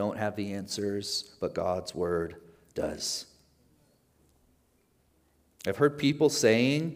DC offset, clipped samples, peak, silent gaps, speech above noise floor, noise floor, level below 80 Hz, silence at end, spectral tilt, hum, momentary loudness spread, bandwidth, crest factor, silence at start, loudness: under 0.1%; under 0.1%; -10 dBFS; none; 40 dB; -69 dBFS; -64 dBFS; 0 s; -4.5 dB/octave; none; 12 LU; 16 kHz; 22 dB; 0 s; -29 LUFS